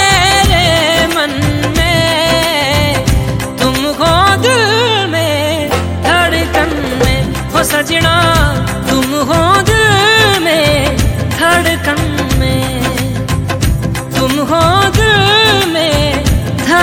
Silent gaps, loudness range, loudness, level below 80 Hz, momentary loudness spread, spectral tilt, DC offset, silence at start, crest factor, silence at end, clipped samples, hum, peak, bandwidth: none; 3 LU; -11 LUFS; -22 dBFS; 7 LU; -4 dB/octave; under 0.1%; 0 s; 10 dB; 0 s; under 0.1%; none; 0 dBFS; 17.5 kHz